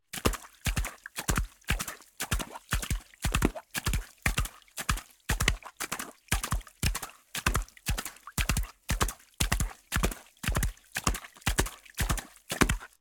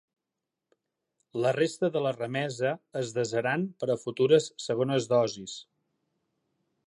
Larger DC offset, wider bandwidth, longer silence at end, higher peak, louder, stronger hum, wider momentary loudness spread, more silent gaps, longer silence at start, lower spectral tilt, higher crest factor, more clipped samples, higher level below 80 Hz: neither; first, 18 kHz vs 11.5 kHz; second, 0.15 s vs 1.25 s; first, -6 dBFS vs -10 dBFS; second, -32 LUFS vs -28 LUFS; neither; second, 7 LU vs 10 LU; neither; second, 0.15 s vs 1.35 s; second, -3.5 dB/octave vs -5 dB/octave; first, 26 dB vs 20 dB; neither; first, -36 dBFS vs -76 dBFS